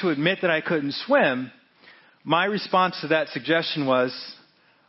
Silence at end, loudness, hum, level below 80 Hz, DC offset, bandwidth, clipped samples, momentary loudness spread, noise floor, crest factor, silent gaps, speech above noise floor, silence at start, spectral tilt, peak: 0.55 s; -23 LUFS; none; -76 dBFS; under 0.1%; 6 kHz; under 0.1%; 12 LU; -53 dBFS; 18 dB; none; 30 dB; 0 s; -8.5 dB/octave; -6 dBFS